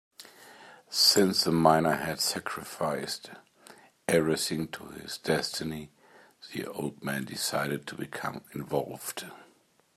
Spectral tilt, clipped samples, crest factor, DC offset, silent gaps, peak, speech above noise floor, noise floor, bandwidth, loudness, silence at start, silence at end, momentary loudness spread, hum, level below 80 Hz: -3.5 dB/octave; under 0.1%; 24 dB; under 0.1%; none; -6 dBFS; 35 dB; -65 dBFS; 16 kHz; -29 LUFS; 0.2 s; 0.55 s; 18 LU; none; -66 dBFS